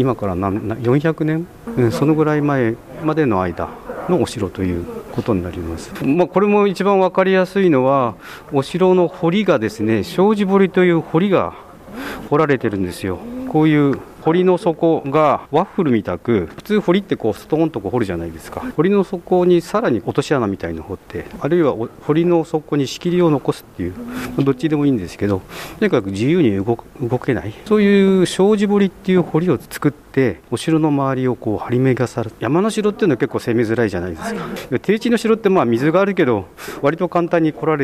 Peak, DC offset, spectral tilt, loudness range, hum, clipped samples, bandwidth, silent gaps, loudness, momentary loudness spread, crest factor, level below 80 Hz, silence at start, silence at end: -2 dBFS; under 0.1%; -7 dB/octave; 3 LU; none; under 0.1%; 15 kHz; none; -17 LUFS; 11 LU; 14 dB; -46 dBFS; 0 s; 0 s